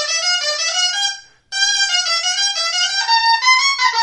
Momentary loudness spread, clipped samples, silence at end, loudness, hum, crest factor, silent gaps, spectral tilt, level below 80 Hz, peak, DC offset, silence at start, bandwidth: 6 LU; under 0.1%; 0 s; -14 LUFS; none; 16 dB; none; 5.5 dB/octave; -64 dBFS; 0 dBFS; under 0.1%; 0 s; 11.5 kHz